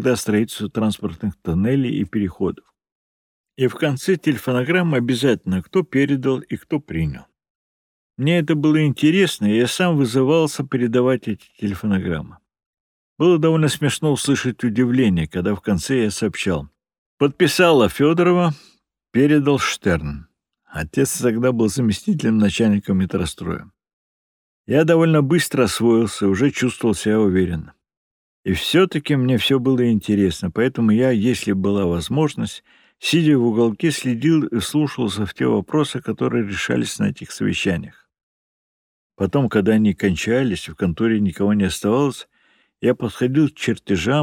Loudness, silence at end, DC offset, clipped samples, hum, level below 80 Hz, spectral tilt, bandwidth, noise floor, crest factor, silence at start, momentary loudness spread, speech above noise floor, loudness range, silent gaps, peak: -19 LUFS; 0 s; under 0.1%; under 0.1%; none; -46 dBFS; -6 dB/octave; 18.5 kHz; -60 dBFS; 18 dB; 0 s; 9 LU; 42 dB; 4 LU; 2.92-3.44 s, 7.50-8.10 s, 12.66-12.74 s, 12.80-13.16 s, 16.98-17.18 s, 23.93-24.64 s, 27.97-28.43 s, 38.23-39.10 s; -2 dBFS